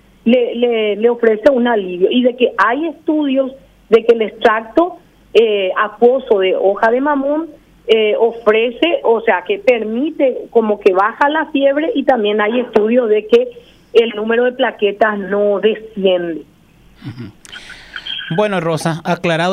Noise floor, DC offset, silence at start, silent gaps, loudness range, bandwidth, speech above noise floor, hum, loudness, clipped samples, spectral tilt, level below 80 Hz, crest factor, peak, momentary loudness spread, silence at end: -35 dBFS; under 0.1%; 0.25 s; none; 4 LU; 11.5 kHz; 21 dB; none; -14 LUFS; under 0.1%; -6 dB/octave; -54 dBFS; 14 dB; 0 dBFS; 10 LU; 0 s